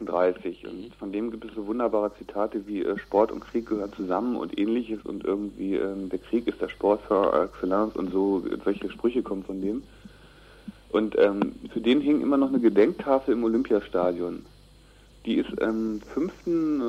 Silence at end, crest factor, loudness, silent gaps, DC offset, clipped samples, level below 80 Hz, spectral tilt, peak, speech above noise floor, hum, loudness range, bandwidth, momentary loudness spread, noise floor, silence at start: 0 s; 18 dB; -26 LUFS; none; under 0.1%; under 0.1%; -54 dBFS; -7.5 dB/octave; -8 dBFS; 27 dB; none; 5 LU; 11 kHz; 11 LU; -53 dBFS; 0 s